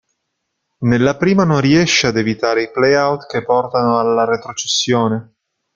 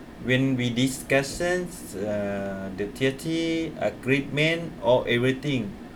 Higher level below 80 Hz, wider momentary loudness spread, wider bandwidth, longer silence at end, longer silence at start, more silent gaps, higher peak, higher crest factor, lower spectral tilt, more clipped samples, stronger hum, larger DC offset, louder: about the same, -50 dBFS vs -50 dBFS; about the same, 6 LU vs 8 LU; second, 9 kHz vs 18.5 kHz; first, 0.55 s vs 0 s; first, 0.8 s vs 0 s; neither; first, 0 dBFS vs -8 dBFS; about the same, 14 dB vs 18 dB; about the same, -4.5 dB/octave vs -5.5 dB/octave; neither; neither; neither; first, -15 LUFS vs -26 LUFS